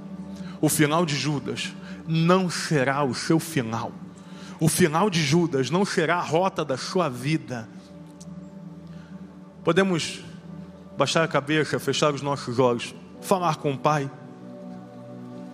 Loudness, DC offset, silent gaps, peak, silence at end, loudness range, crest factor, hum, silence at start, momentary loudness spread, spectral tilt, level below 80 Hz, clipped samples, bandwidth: -24 LUFS; under 0.1%; none; -4 dBFS; 0 s; 6 LU; 22 dB; none; 0 s; 21 LU; -5 dB/octave; -66 dBFS; under 0.1%; 15.5 kHz